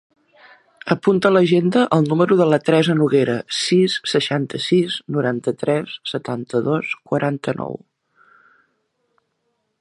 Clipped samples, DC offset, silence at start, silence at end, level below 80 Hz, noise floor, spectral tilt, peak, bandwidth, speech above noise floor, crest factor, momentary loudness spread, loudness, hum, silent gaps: under 0.1%; under 0.1%; 0.85 s; 2.05 s; -64 dBFS; -71 dBFS; -6 dB/octave; 0 dBFS; 11.5 kHz; 53 dB; 18 dB; 10 LU; -18 LUFS; none; none